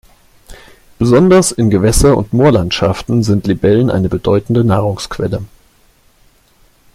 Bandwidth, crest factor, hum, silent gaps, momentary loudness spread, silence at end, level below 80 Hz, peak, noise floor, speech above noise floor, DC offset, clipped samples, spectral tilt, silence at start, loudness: 15.5 kHz; 12 dB; none; none; 9 LU; 1.5 s; -30 dBFS; 0 dBFS; -50 dBFS; 39 dB; under 0.1%; under 0.1%; -6 dB/octave; 0.5 s; -12 LUFS